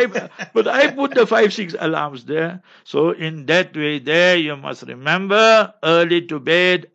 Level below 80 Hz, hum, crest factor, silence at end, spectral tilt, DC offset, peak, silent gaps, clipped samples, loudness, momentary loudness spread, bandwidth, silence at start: -70 dBFS; none; 16 dB; 0.1 s; -4.5 dB/octave; under 0.1%; -2 dBFS; none; under 0.1%; -17 LUFS; 11 LU; 8.2 kHz; 0 s